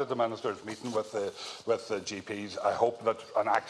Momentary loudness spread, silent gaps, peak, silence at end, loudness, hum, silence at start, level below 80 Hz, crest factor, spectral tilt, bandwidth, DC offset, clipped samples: 9 LU; none; -10 dBFS; 0 s; -32 LUFS; none; 0 s; -74 dBFS; 20 dB; -4 dB/octave; 12.5 kHz; under 0.1%; under 0.1%